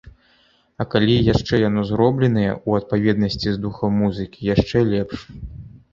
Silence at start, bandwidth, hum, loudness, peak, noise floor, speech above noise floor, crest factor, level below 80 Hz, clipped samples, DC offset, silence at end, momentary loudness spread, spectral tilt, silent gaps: 0.05 s; 7.4 kHz; none; -20 LUFS; -2 dBFS; -58 dBFS; 39 dB; 18 dB; -40 dBFS; under 0.1%; under 0.1%; 0.25 s; 13 LU; -7.5 dB/octave; none